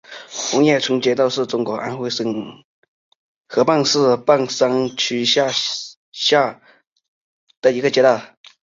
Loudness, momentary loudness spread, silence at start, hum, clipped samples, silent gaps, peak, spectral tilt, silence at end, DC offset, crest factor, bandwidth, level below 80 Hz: -18 LUFS; 9 LU; 0.1 s; none; under 0.1%; 2.64-3.44 s, 5.97-6.12 s, 6.92-6.96 s, 7.08-7.47 s, 7.57-7.62 s; -2 dBFS; -3.5 dB/octave; 0.35 s; under 0.1%; 18 dB; 7.8 kHz; -64 dBFS